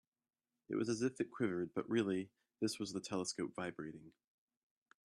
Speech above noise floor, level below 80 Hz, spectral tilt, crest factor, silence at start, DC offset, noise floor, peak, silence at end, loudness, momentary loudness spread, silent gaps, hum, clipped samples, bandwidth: over 50 dB; -80 dBFS; -5 dB/octave; 18 dB; 0.7 s; under 0.1%; under -90 dBFS; -24 dBFS; 0.95 s; -41 LUFS; 10 LU; none; none; under 0.1%; 12.5 kHz